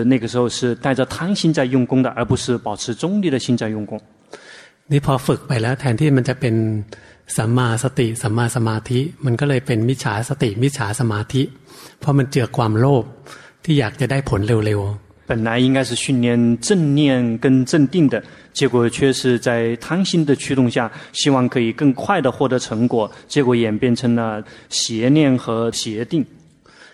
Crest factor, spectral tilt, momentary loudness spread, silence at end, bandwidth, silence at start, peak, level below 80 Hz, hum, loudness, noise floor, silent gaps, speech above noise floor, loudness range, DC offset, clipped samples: 16 dB; -6 dB/octave; 7 LU; 0.7 s; 13.5 kHz; 0 s; -2 dBFS; -48 dBFS; none; -18 LUFS; -47 dBFS; none; 29 dB; 4 LU; under 0.1%; under 0.1%